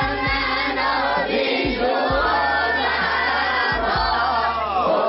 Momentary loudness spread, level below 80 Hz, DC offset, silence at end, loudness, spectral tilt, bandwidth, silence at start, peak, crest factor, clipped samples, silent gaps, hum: 2 LU; -38 dBFS; under 0.1%; 0 s; -20 LUFS; -1.5 dB/octave; 6 kHz; 0 s; -8 dBFS; 12 dB; under 0.1%; none; none